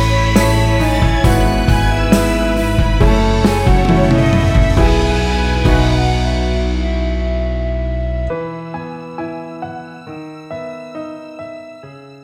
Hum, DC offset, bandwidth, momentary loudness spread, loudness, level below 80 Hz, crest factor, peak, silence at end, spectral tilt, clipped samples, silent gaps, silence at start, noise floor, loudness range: none; under 0.1%; 16 kHz; 17 LU; -15 LUFS; -18 dBFS; 14 dB; 0 dBFS; 0.05 s; -6 dB/octave; under 0.1%; none; 0 s; -36 dBFS; 14 LU